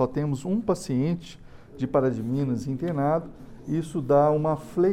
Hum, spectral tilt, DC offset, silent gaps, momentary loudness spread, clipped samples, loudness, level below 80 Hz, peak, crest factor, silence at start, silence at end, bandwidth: none; -8 dB/octave; under 0.1%; none; 11 LU; under 0.1%; -26 LUFS; -50 dBFS; -10 dBFS; 16 dB; 0 s; 0 s; 14.5 kHz